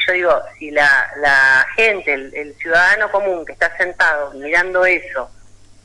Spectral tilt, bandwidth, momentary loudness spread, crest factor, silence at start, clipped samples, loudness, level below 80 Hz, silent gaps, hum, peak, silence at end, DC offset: -2.5 dB/octave; 11.5 kHz; 10 LU; 14 dB; 0 s; under 0.1%; -14 LUFS; -46 dBFS; none; none; -4 dBFS; 0.55 s; under 0.1%